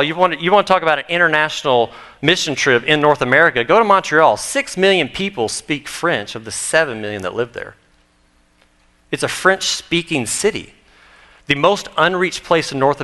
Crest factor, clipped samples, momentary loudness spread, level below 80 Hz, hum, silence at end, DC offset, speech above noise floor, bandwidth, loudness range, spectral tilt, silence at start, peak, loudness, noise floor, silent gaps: 16 dB; under 0.1%; 11 LU; -52 dBFS; none; 0 s; under 0.1%; 40 dB; 12.5 kHz; 8 LU; -3.5 dB/octave; 0 s; 0 dBFS; -16 LUFS; -56 dBFS; none